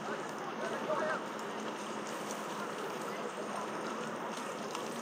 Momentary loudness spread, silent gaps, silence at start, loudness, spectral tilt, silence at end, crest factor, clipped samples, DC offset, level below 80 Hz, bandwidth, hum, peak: 5 LU; none; 0 s; -39 LUFS; -3.5 dB/octave; 0 s; 18 dB; under 0.1%; under 0.1%; -90 dBFS; 16.5 kHz; none; -22 dBFS